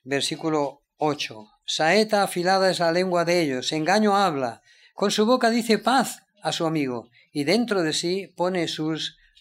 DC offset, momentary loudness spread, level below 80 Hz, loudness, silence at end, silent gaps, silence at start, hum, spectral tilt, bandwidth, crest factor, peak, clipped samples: under 0.1%; 10 LU; -72 dBFS; -23 LUFS; 0.3 s; none; 0.05 s; none; -4 dB/octave; 16 kHz; 18 dB; -6 dBFS; under 0.1%